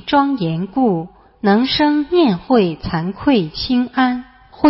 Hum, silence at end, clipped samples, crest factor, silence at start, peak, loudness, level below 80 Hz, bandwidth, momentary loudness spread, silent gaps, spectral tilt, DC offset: none; 0 s; under 0.1%; 16 dB; 0.05 s; 0 dBFS; -17 LUFS; -44 dBFS; 5.8 kHz; 8 LU; none; -10.5 dB/octave; under 0.1%